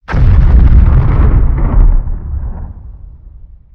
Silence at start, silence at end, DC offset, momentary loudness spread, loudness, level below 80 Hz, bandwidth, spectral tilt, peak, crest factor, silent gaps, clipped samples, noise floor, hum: 0.1 s; 0.65 s; under 0.1%; 18 LU; -11 LUFS; -10 dBFS; 3.6 kHz; -10.5 dB/octave; 0 dBFS; 8 dB; none; 3%; -34 dBFS; none